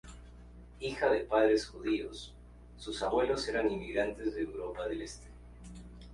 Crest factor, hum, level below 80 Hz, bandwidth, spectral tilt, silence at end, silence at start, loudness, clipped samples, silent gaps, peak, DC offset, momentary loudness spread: 20 dB; 60 Hz at -50 dBFS; -52 dBFS; 11.5 kHz; -5 dB/octave; 0 s; 0.05 s; -33 LUFS; under 0.1%; none; -14 dBFS; under 0.1%; 23 LU